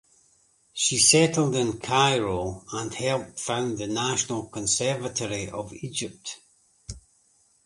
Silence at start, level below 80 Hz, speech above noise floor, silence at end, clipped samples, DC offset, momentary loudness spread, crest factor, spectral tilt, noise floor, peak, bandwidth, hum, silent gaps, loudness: 0.75 s; -54 dBFS; 38 dB; 0.65 s; under 0.1%; under 0.1%; 19 LU; 24 dB; -3 dB/octave; -64 dBFS; -2 dBFS; 11.5 kHz; none; none; -24 LUFS